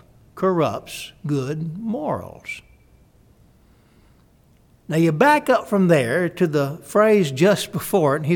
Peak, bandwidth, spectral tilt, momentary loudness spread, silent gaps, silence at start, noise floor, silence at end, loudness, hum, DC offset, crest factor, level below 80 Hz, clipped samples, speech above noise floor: -2 dBFS; 19 kHz; -6 dB/octave; 14 LU; none; 0.35 s; -55 dBFS; 0 s; -20 LUFS; none; under 0.1%; 18 dB; -56 dBFS; under 0.1%; 36 dB